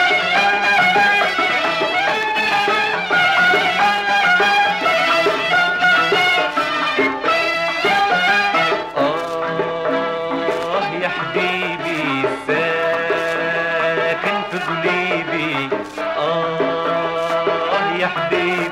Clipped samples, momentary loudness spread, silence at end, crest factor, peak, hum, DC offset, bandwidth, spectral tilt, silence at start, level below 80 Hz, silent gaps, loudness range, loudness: under 0.1%; 7 LU; 0 s; 12 dB; -6 dBFS; none; under 0.1%; 16.5 kHz; -3.5 dB/octave; 0 s; -56 dBFS; none; 5 LU; -17 LUFS